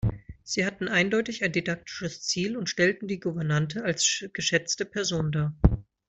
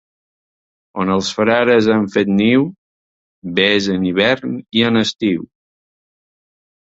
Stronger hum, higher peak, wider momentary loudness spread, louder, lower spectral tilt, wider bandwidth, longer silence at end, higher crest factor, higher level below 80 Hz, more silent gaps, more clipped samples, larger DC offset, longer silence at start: neither; second, -4 dBFS vs 0 dBFS; about the same, 7 LU vs 9 LU; second, -27 LUFS vs -16 LUFS; second, -4 dB/octave vs -5.5 dB/octave; about the same, 8.2 kHz vs 7.8 kHz; second, 0.25 s vs 1.4 s; first, 24 dB vs 16 dB; first, -40 dBFS vs -52 dBFS; second, none vs 2.78-3.42 s; neither; neither; second, 0 s vs 0.95 s